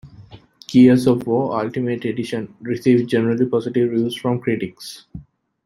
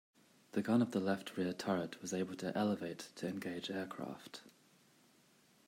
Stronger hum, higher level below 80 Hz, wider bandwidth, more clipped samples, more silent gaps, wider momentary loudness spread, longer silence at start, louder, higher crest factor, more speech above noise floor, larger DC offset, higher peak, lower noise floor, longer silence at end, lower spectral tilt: neither; first, -54 dBFS vs -84 dBFS; second, 12.5 kHz vs 16 kHz; neither; neither; about the same, 14 LU vs 13 LU; second, 0.05 s vs 0.55 s; first, -19 LUFS vs -39 LUFS; about the same, 16 dB vs 18 dB; second, 26 dB vs 31 dB; neither; first, -2 dBFS vs -22 dBFS; second, -44 dBFS vs -69 dBFS; second, 0.45 s vs 1.15 s; first, -7 dB/octave vs -5.5 dB/octave